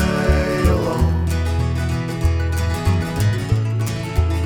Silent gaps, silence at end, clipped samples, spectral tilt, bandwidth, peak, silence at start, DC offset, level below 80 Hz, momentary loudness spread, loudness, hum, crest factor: none; 0 s; under 0.1%; -6.5 dB/octave; 17 kHz; -4 dBFS; 0 s; under 0.1%; -24 dBFS; 4 LU; -20 LUFS; none; 14 dB